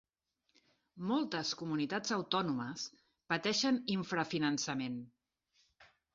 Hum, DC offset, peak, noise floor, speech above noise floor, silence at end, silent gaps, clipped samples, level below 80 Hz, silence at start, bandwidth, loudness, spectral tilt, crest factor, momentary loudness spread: none; under 0.1%; -16 dBFS; -83 dBFS; 47 dB; 0.3 s; none; under 0.1%; -76 dBFS; 0.95 s; 7.6 kHz; -36 LUFS; -3 dB/octave; 22 dB; 10 LU